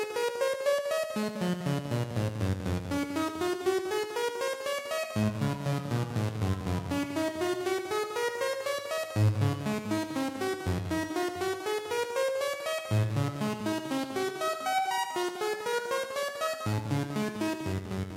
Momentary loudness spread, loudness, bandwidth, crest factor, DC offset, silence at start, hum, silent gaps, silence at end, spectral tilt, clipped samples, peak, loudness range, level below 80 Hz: 4 LU; -31 LUFS; 16 kHz; 16 dB; under 0.1%; 0 s; none; none; 0 s; -5.5 dB/octave; under 0.1%; -14 dBFS; 1 LU; -58 dBFS